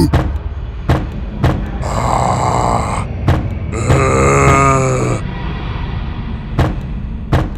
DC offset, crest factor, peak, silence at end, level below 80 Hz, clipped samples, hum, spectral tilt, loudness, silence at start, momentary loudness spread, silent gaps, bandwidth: under 0.1%; 14 dB; 0 dBFS; 0 s; -22 dBFS; under 0.1%; none; -6 dB/octave; -16 LUFS; 0 s; 13 LU; none; 13 kHz